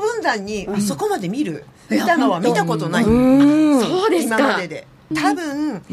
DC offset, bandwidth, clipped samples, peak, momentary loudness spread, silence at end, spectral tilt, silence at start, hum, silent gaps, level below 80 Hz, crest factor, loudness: under 0.1%; 15 kHz; under 0.1%; -4 dBFS; 11 LU; 0 s; -5.5 dB/octave; 0 s; none; none; -44 dBFS; 14 dB; -18 LUFS